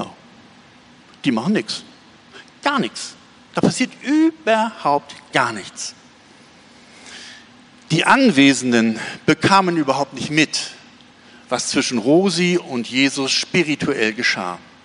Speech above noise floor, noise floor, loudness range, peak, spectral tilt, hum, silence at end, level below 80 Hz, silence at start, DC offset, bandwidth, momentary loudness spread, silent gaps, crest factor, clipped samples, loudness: 29 dB; -47 dBFS; 8 LU; -2 dBFS; -4 dB/octave; none; 0.25 s; -60 dBFS; 0 s; under 0.1%; 10.5 kHz; 15 LU; none; 18 dB; under 0.1%; -18 LUFS